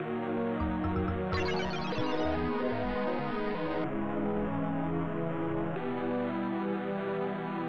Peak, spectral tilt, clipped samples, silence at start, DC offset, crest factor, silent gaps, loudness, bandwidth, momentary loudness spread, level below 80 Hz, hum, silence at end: -18 dBFS; -7.5 dB/octave; under 0.1%; 0 s; under 0.1%; 14 dB; none; -33 LUFS; 7.2 kHz; 2 LU; -48 dBFS; none; 0 s